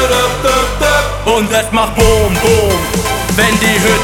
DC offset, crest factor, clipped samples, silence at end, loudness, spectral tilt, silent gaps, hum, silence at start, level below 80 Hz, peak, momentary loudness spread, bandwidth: under 0.1%; 12 dB; under 0.1%; 0 s; -11 LUFS; -3.5 dB/octave; none; none; 0 s; -22 dBFS; 0 dBFS; 4 LU; 18.5 kHz